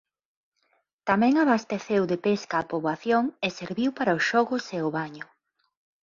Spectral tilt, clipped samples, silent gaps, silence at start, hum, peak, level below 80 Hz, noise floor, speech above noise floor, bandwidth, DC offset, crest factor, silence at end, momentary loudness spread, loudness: -5.5 dB/octave; under 0.1%; none; 1.05 s; none; -8 dBFS; -68 dBFS; -72 dBFS; 47 dB; 7.4 kHz; under 0.1%; 18 dB; 0.8 s; 10 LU; -25 LUFS